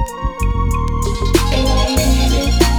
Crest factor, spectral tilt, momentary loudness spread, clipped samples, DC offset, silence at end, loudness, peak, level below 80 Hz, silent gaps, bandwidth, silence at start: 14 dB; -5 dB/octave; 5 LU; under 0.1%; under 0.1%; 0 s; -16 LUFS; 0 dBFS; -16 dBFS; none; over 20 kHz; 0 s